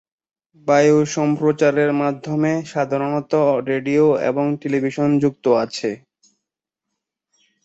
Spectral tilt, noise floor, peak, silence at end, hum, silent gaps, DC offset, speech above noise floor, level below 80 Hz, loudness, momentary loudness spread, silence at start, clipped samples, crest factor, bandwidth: -6.5 dB/octave; -83 dBFS; -2 dBFS; 1.7 s; none; none; under 0.1%; 65 dB; -64 dBFS; -18 LUFS; 6 LU; 0.65 s; under 0.1%; 16 dB; 8 kHz